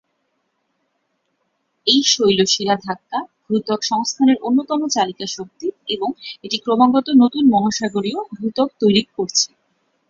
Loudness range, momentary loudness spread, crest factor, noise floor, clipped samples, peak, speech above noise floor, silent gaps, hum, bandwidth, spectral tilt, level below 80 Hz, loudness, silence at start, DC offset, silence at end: 3 LU; 12 LU; 18 dB; -70 dBFS; under 0.1%; -2 dBFS; 52 dB; none; none; 7.6 kHz; -3.5 dB/octave; -62 dBFS; -18 LUFS; 1.85 s; under 0.1%; 0.65 s